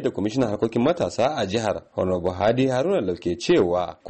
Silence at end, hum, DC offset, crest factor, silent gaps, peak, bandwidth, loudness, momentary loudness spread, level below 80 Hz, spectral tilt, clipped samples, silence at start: 0 s; none; under 0.1%; 12 dB; none; -10 dBFS; 8.8 kHz; -23 LUFS; 6 LU; -52 dBFS; -6 dB/octave; under 0.1%; 0 s